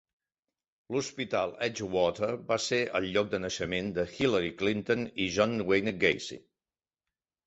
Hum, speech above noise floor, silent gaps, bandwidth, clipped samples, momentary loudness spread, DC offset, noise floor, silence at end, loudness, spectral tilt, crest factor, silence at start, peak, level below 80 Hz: none; over 60 dB; none; 8.2 kHz; under 0.1%; 6 LU; under 0.1%; under -90 dBFS; 1.1 s; -30 LUFS; -4.5 dB/octave; 22 dB; 0.9 s; -10 dBFS; -60 dBFS